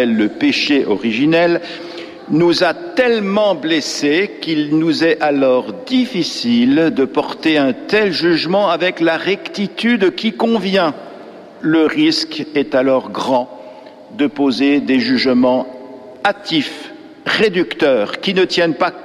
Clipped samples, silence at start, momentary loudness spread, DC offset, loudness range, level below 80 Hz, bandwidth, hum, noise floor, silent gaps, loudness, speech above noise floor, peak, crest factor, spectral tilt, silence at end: under 0.1%; 0 s; 8 LU; under 0.1%; 2 LU; -58 dBFS; 12.5 kHz; none; -36 dBFS; none; -15 LUFS; 21 dB; -2 dBFS; 12 dB; -5 dB/octave; 0 s